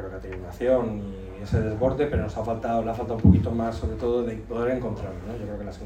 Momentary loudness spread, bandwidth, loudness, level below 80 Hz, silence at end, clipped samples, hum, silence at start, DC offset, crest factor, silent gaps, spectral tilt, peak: 14 LU; 8.8 kHz; -26 LUFS; -38 dBFS; 0 s; under 0.1%; none; 0 s; under 0.1%; 22 dB; none; -9 dB/octave; -2 dBFS